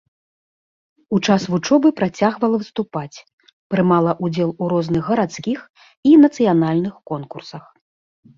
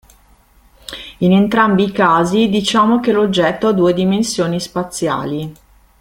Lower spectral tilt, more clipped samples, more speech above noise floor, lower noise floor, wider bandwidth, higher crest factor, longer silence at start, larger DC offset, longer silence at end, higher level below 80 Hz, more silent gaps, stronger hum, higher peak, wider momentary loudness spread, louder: first, -7 dB/octave vs -5.5 dB/octave; neither; first, over 73 dB vs 36 dB; first, under -90 dBFS vs -50 dBFS; second, 7.4 kHz vs 16 kHz; about the same, 16 dB vs 14 dB; first, 1.1 s vs 0.9 s; neither; first, 0.8 s vs 0.45 s; second, -58 dBFS vs -48 dBFS; first, 3.33-3.38 s, 3.53-3.70 s, 5.70-5.74 s, 5.97-6.03 s vs none; neither; about the same, -2 dBFS vs 0 dBFS; about the same, 15 LU vs 13 LU; second, -18 LUFS vs -14 LUFS